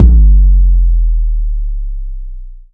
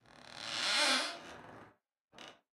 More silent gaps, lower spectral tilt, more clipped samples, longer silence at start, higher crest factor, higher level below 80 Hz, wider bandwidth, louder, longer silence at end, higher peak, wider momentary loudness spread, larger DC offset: second, none vs 2.01-2.08 s; first, -13 dB/octave vs 0 dB/octave; first, 0.5% vs under 0.1%; second, 0 s vs 0.15 s; second, 8 dB vs 20 dB; first, -8 dBFS vs -78 dBFS; second, 0.5 kHz vs 16 kHz; first, -13 LUFS vs -32 LUFS; second, 0.1 s vs 0.25 s; first, 0 dBFS vs -18 dBFS; second, 19 LU vs 25 LU; neither